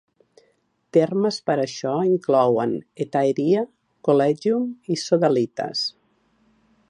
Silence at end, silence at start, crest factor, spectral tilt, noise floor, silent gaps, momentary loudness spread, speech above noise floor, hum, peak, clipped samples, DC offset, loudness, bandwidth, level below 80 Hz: 1 s; 0.95 s; 18 dB; -6 dB/octave; -65 dBFS; none; 8 LU; 45 dB; none; -4 dBFS; under 0.1%; under 0.1%; -22 LUFS; 11 kHz; -72 dBFS